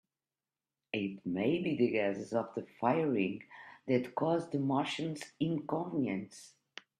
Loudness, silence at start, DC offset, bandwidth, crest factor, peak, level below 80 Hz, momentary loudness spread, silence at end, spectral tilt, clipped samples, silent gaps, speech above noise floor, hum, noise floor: -34 LUFS; 0.95 s; under 0.1%; 12.5 kHz; 18 dB; -16 dBFS; -76 dBFS; 15 LU; 0.5 s; -6.5 dB/octave; under 0.1%; none; over 56 dB; none; under -90 dBFS